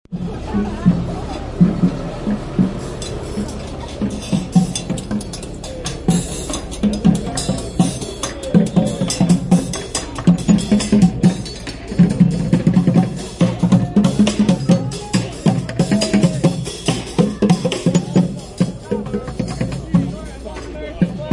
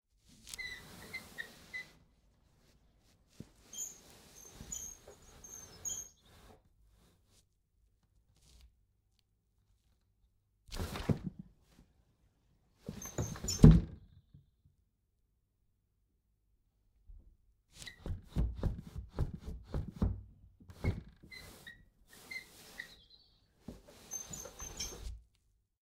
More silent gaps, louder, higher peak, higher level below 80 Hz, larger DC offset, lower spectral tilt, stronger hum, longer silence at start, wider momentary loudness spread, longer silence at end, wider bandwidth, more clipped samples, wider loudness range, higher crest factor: neither; first, -18 LUFS vs -36 LUFS; first, 0 dBFS vs -4 dBFS; first, -34 dBFS vs -46 dBFS; neither; about the same, -6 dB/octave vs -5.5 dB/octave; neither; second, 0.1 s vs 0.45 s; second, 12 LU vs 17 LU; second, 0 s vs 0.65 s; second, 11.5 kHz vs 16 kHz; neither; second, 6 LU vs 17 LU; second, 16 dB vs 34 dB